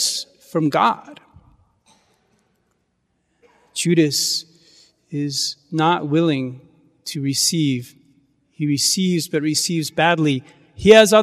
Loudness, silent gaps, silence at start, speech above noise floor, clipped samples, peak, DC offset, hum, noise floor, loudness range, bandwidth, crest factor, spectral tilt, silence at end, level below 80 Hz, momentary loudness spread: -19 LUFS; none; 0 s; 51 dB; under 0.1%; 0 dBFS; under 0.1%; none; -69 dBFS; 6 LU; 15.5 kHz; 20 dB; -4 dB/octave; 0 s; -56 dBFS; 11 LU